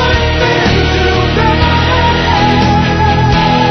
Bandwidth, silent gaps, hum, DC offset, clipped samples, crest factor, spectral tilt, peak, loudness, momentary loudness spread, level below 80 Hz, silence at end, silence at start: 6.4 kHz; none; none; 0.4%; under 0.1%; 10 dB; -6 dB/octave; 0 dBFS; -10 LUFS; 1 LU; -20 dBFS; 0 s; 0 s